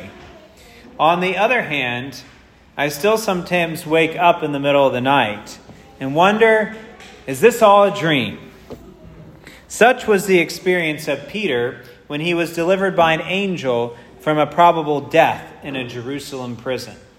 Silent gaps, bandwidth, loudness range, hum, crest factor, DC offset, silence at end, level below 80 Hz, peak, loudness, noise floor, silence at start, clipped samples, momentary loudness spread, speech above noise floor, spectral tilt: none; 16 kHz; 3 LU; none; 18 dB; under 0.1%; 0.2 s; -54 dBFS; 0 dBFS; -17 LUFS; -43 dBFS; 0 s; under 0.1%; 15 LU; 26 dB; -5 dB/octave